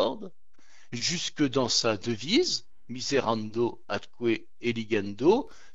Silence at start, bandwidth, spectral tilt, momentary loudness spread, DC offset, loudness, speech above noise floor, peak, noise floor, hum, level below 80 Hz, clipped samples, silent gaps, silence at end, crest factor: 0 s; 8 kHz; -4 dB/octave; 11 LU; 0.9%; -28 LUFS; 35 dB; -10 dBFS; -63 dBFS; none; -62 dBFS; under 0.1%; none; 0.25 s; 20 dB